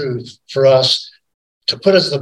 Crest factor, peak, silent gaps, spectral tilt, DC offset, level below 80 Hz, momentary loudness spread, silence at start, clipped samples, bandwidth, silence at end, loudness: 16 dB; 0 dBFS; 1.34-1.61 s; -4.5 dB/octave; under 0.1%; -62 dBFS; 13 LU; 0 s; under 0.1%; 12 kHz; 0 s; -14 LUFS